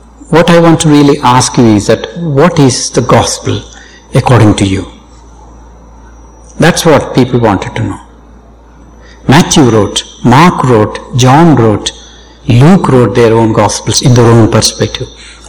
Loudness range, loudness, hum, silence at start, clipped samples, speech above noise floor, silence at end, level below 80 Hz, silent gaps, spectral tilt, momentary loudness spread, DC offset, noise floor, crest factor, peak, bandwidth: 5 LU; -7 LUFS; none; 0.3 s; 10%; 29 dB; 0.15 s; -30 dBFS; none; -5.5 dB/octave; 11 LU; under 0.1%; -35 dBFS; 8 dB; 0 dBFS; 19.5 kHz